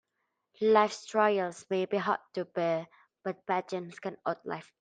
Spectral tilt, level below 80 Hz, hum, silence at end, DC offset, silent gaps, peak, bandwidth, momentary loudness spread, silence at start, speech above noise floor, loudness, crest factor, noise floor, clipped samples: -5 dB/octave; -80 dBFS; none; 0.2 s; under 0.1%; none; -10 dBFS; 9.4 kHz; 14 LU; 0.6 s; 52 dB; -31 LUFS; 22 dB; -82 dBFS; under 0.1%